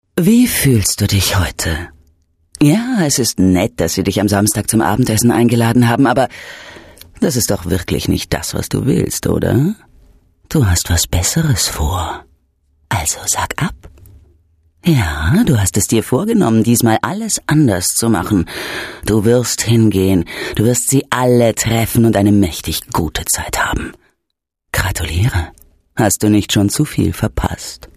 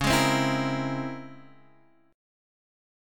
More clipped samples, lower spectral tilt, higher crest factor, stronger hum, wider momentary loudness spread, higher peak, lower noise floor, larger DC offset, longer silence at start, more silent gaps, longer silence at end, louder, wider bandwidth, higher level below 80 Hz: neither; about the same, -5 dB/octave vs -4.5 dB/octave; second, 14 dB vs 20 dB; neither; second, 9 LU vs 18 LU; first, 0 dBFS vs -10 dBFS; first, -76 dBFS vs -61 dBFS; neither; first, 0.15 s vs 0 s; neither; second, 0.1 s vs 0.95 s; first, -14 LUFS vs -26 LUFS; second, 15 kHz vs 17.5 kHz; first, -32 dBFS vs -50 dBFS